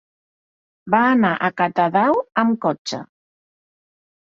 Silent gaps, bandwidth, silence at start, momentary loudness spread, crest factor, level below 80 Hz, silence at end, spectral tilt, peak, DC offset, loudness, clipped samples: 2.78-2.85 s; 7.6 kHz; 0.85 s; 10 LU; 18 dB; -64 dBFS; 1.2 s; -6 dB/octave; -2 dBFS; under 0.1%; -18 LUFS; under 0.1%